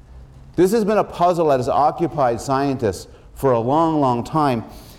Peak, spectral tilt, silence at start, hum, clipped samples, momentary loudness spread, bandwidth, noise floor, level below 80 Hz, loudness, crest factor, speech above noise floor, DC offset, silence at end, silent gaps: -6 dBFS; -6.5 dB/octave; 0.1 s; none; under 0.1%; 6 LU; 16.5 kHz; -41 dBFS; -44 dBFS; -19 LUFS; 12 dB; 23 dB; under 0.1%; 0.05 s; none